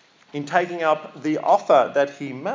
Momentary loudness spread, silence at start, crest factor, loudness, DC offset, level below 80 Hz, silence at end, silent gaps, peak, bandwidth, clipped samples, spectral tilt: 13 LU; 0.35 s; 18 dB; -21 LUFS; under 0.1%; -82 dBFS; 0 s; none; -4 dBFS; 7.6 kHz; under 0.1%; -5.5 dB/octave